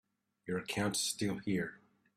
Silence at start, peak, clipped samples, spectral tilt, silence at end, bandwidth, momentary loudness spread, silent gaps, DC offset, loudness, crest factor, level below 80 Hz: 0.45 s; -22 dBFS; under 0.1%; -3.5 dB/octave; 0.4 s; 15.5 kHz; 9 LU; none; under 0.1%; -36 LUFS; 16 dB; -70 dBFS